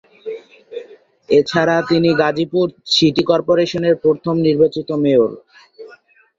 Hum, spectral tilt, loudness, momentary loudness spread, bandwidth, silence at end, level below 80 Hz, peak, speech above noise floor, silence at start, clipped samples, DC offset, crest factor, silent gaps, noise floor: none; -6 dB/octave; -16 LUFS; 17 LU; 7.8 kHz; 0.5 s; -56 dBFS; 0 dBFS; 32 dB; 0.25 s; under 0.1%; under 0.1%; 16 dB; none; -47 dBFS